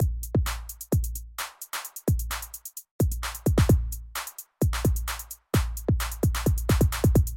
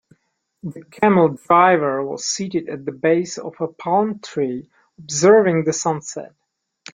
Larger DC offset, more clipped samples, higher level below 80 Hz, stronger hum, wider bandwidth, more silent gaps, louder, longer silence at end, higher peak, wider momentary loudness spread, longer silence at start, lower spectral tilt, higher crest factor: neither; neither; first, -30 dBFS vs -64 dBFS; neither; first, 17 kHz vs 9.6 kHz; first, 2.91-2.99 s vs none; second, -27 LUFS vs -18 LUFS; second, 0 s vs 0.65 s; second, -8 dBFS vs 0 dBFS; second, 12 LU vs 18 LU; second, 0 s vs 0.65 s; about the same, -5.5 dB/octave vs -5 dB/octave; about the same, 16 dB vs 18 dB